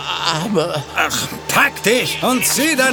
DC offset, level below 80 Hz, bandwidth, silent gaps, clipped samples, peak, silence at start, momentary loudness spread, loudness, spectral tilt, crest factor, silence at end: under 0.1%; -48 dBFS; over 20 kHz; none; under 0.1%; 0 dBFS; 0 s; 5 LU; -16 LUFS; -2.5 dB/octave; 18 dB; 0 s